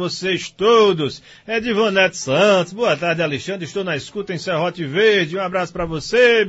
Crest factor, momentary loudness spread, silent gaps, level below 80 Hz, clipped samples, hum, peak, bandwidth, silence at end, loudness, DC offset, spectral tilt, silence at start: 16 dB; 11 LU; none; -50 dBFS; under 0.1%; none; -2 dBFS; 8 kHz; 0 s; -18 LUFS; under 0.1%; -4.5 dB/octave; 0 s